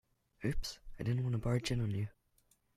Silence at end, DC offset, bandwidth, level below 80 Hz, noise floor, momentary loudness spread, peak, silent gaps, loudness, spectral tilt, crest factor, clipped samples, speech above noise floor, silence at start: 0.65 s; under 0.1%; 14 kHz; -48 dBFS; -74 dBFS; 8 LU; -20 dBFS; none; -38 LUFS; -6 dB/octave; 16 dB; under 0.1%; 38 dB; 0.4 s